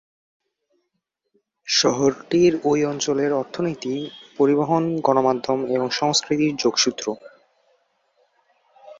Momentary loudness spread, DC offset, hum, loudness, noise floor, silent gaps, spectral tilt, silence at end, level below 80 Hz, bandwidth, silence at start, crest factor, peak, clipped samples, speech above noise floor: 10 LU; under 0.1%; none; -21 LUFS; -77 dBFS; none; -4 dB/octave; 0.05 s; -64 dBFS; 7.8 kHz; 1.65 s; 20 dB; -2 dBFS; under 0.1%; 57 dB